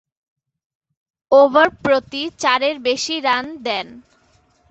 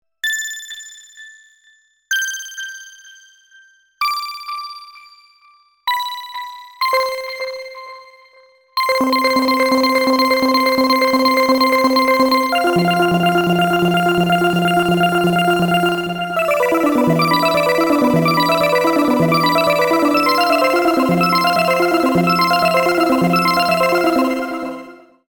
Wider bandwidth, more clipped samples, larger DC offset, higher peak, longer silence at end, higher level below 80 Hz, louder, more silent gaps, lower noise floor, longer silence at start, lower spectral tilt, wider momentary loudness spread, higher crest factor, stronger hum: second, 8.2 kHz vs 20 kHz; neither; neither; about the same, -2 dBFS vs -2 dBFS; first, 0.7 s vs 0.35 s; about the same, -58 dBFS vs -54 dBFS; about the same, -17 LUFS vs -15 LUFS; neither; about the same, -58 dBFS vs -55 dBFS; first, 1.3 s vs 0.25 s; second, -2.5 dB/octave vs -5 dB/octave; about the same, 11 LU vs 13 LU; about the same, 18 dB vs 16 dB; neither